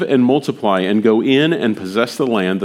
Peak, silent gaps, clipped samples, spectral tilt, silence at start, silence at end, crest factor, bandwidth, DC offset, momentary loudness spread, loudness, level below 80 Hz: 0 dBFS; none; under 0.1%; -6 dB/octave; 0 s; 0 s; 14 dB; 15 kHz; under 0.1%; 5 LU; -16 LUFS; -68 dBFS